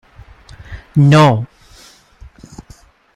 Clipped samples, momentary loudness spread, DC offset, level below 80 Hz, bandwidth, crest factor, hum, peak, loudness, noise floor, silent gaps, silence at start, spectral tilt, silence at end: under 0.1%; 27 LU; under 0.1%; -42 dBFS; 11 kHz; 16 dB; none; 0 dBFS; -11 LUFS; -44 dBFS; none; 0.7 s; -7 dB/octave; 1.7 s